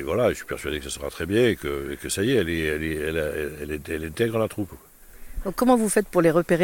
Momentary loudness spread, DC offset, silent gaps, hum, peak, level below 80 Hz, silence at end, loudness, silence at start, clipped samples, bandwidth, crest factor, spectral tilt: 12 LU; under 0.1%; none; none; -6 dBFS; -42 dBFS; 0 s; -24 LUFS; 0 s; under 0.1%; 17.5 kHz; 18 dB; -5 dB/octave